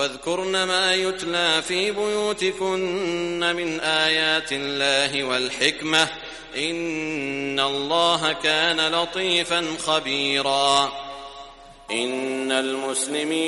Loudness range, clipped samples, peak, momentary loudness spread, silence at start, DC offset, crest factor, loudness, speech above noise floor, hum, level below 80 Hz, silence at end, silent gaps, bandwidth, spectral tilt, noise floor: 2 LU; under 0.1%; -2 dBFS; 7 LU; 0 s; under 0.1%; 20 dB; -22 LUFS; 20 dB; none; -56 dBFS; 0 s; none; 11.5 kHz; -2 dB/octave; -43 dBFS